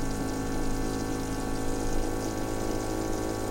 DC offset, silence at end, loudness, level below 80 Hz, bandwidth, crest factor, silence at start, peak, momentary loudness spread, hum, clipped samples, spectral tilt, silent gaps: under 0.1%; 0 s; -32 LUFS; -34 dBFS; 16 kHz; 14 dB; 0 s; -16 dBFS; 1 LU; none; under 0.1%; -5 dB/octave; none